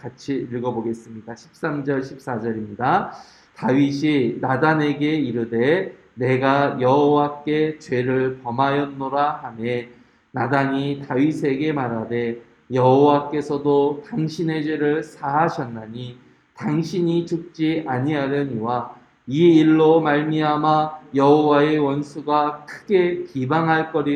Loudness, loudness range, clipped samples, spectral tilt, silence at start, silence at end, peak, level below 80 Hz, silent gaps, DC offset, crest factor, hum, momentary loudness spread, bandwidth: -20 LUFS; 6 LU; under 0.1%; -7.5 dB/octave; 0.05 s; 0 s; -2 dBFS; -62 dBFS; none; under 0.1%; 18 dB; none; 13 LU; 9.2 kHz